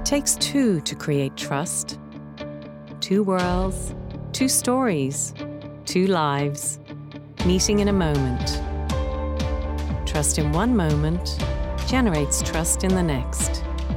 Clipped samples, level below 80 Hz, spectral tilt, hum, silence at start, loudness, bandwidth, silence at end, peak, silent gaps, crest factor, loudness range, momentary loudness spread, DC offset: under 0.1%; -32 dBFS; -4.5 dB/octave; none; 0 s; -23 LUFS; 17.5 kHz; 0 s; -8 dBFS; none; 14 dB; 2 LU; 14 LU; under 0.1%